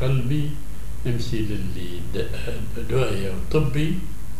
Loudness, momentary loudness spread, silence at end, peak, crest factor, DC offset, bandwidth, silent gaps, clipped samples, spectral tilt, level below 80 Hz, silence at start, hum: -26 LUFS; 9 LU; 0 s; -6 dBFS; 16 dB; 9%; 16 kHz; none; under 0.1%; -7 dB/octave; -34 dBFS; 0 s; none